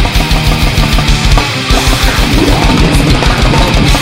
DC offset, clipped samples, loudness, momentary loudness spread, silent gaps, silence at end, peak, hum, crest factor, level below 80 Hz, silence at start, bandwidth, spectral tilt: under 0.1%; 0.4%; -9 LUFS; 2 LU; none; 0 s; 0 dBFS; none; 8 dB; -12 dBFS; 0 s; 16.5 kHz; -4.5 dB/octave